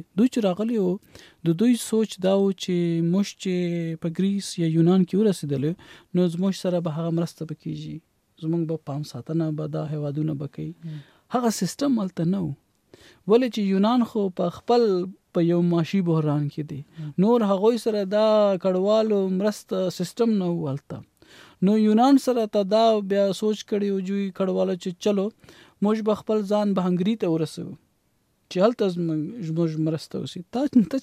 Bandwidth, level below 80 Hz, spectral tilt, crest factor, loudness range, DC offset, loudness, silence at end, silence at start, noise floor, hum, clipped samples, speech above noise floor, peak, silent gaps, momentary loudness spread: 15 kHz; -68 dBFS; -7 dB/octave; 16 dB; 6 LU; under 0.1%; -24 LUFS; 0 s; 0.15 s; -68 dBFS; none; under 0.1%; 45 dB; -8 dBFS; none; 13 LU